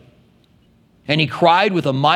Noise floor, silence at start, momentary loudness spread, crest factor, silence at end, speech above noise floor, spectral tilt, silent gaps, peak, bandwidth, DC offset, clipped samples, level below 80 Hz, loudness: -54 dBFS; 1.1 s; 7 LU; 18 dB; 0 s; 39 dB; -6 dB/octave; none; 0 dBFS; 12.5 kHz; under 0.1%; under 0.1%; -60 dBFS; -16 LUFS